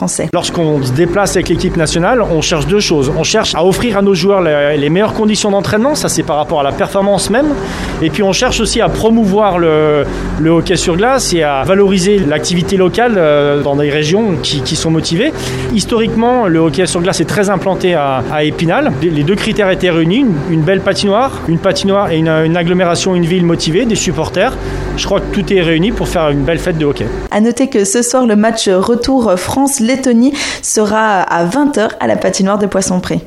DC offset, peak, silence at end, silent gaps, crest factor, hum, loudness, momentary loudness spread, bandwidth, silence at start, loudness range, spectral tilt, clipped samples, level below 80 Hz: under 0.1%; 0 dBFS; 0 s; none; 12 dB; none; -12 LUFS; 4 LU; 15 kHz; 0 s; 2 LU; -5 dB/octave; under 0.1%; -30 dBFS